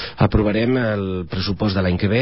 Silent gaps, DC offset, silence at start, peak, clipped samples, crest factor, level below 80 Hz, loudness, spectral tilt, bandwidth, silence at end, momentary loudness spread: none; 0.8%; 0 s; -6 dBFS; under 0.1%; 14 dB; -32 dBFS; -20 LUFS; -11 dB/octave; 5.8 kHz; 0 s; 6 LU